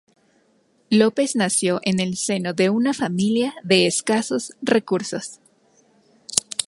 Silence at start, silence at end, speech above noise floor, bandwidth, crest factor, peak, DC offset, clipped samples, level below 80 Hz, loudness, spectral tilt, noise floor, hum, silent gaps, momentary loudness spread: 0.9 s; 0.05 s; 41 dB; 16 kHz; 22 dB; 0 dBFS; under 0.1%; under 0.1%; -64 dBFS; -21 LUFS; -4 dB/octave; -62 dBFS; none; none; 7 LU